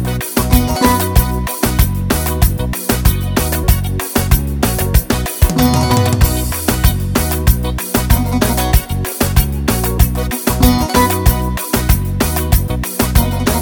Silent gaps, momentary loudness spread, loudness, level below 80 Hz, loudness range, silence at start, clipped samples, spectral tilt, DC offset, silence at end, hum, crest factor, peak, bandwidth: none; 5 LU; -15 LUFS; -18 dBFS; 1 LU; 0 s; under 0.1%; -5 dB/octave; 0.1%; 0 s; none; 14 dB; 0 dBFS; over 20 kHz